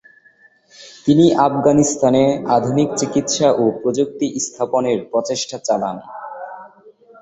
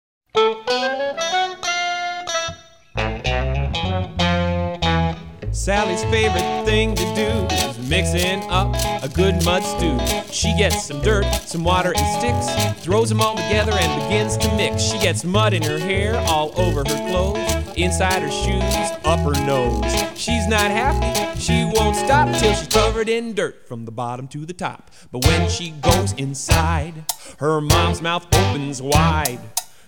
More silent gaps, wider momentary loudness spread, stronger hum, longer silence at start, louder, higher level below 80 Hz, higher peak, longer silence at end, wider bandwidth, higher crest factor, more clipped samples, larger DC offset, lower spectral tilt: neither; first, 17 LU vs 8 LU; neither; first, 0.8 s vs 0.35 s; about the same, -17 LUFS vs -19 LUFS; second, -54 dBFS vs -30 dBFS; about the same, -2 dBFS vs -2 dBFS; about the same, 0.3 s vs 0.2 s; second, 8.2 kHz vs 19.5 kHz; about the same, 16 dB vs 18 dB; neither; second, under 0.1% vs 0.5%; about the same, -5 dB/octave vs -4.5 dB/octave